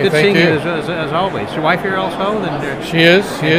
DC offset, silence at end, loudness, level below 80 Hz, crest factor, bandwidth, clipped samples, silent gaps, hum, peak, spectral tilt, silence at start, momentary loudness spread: under 0.1%; 0 s; -14 LUFS; -44 dBFS; 14 dB; 16 kHz; under 0.1%; none; none; 0 dBFS; -5.5 dB/octave; 0 s; 9 LU